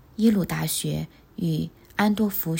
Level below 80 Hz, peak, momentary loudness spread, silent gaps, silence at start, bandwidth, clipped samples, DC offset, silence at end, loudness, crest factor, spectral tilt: -52 dBFS; -8 dBFS; 9 LU; none; 0.2 s; 17 kHz; under 0.1%; under 0.1%; 0 s; -25 LUFS; 18 dB; -5.5 dB/octave